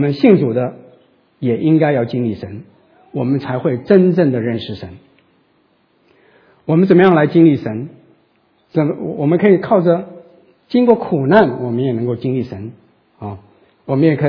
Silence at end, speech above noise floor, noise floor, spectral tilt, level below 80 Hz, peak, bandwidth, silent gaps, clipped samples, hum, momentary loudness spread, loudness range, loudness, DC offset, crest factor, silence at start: 0 s; 44 dB; -58 dBFS; -10.5 dB/octave; -58 dBFS; 0 dBFS; 5.4 kHz; none; under 0.1%; none; 20 LU; 4 LU; -15 LUFS; under 0.1%; 16 dB; 0 s